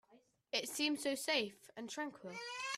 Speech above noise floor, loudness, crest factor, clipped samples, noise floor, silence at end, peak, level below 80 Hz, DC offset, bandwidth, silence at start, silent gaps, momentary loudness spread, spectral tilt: 29 dB; -39 LUFS; 22 dB; under 0.1%; -70 dBFS; 0 s; -20 dBFS; -86 dBFS; under 0.1%; 15.5 kHz; 0.1 s; none; 11 LU; -1.5 dB/octave